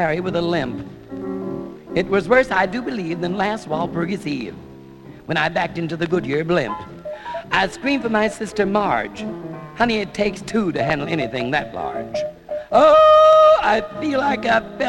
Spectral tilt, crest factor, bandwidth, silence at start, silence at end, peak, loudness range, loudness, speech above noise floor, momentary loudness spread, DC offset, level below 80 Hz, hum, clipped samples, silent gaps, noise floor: -6 dB/octave; 18 dB; 11 kHz; 0 s; 0 s; -2 dBFS; 8 LU; -19 LUFS; 22 dB; 17 LU; under 0.1%; -48 dBFS; none; under 0.1%; none; -40 dBFS